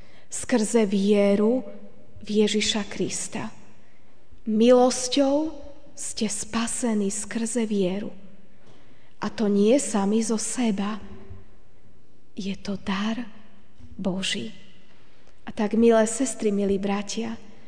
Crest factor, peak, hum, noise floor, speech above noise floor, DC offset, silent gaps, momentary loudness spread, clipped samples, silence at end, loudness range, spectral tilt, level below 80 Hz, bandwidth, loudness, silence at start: 20 dB; -6 dBFS; none; -58 dBFS; 35 dB; 2%; none; 16 LU; under 0.1%; 0.25 s; 8 LU; -4.5 dB/octave; -56 dBFS; 10 kHz; -24 LUFS; 0.3 s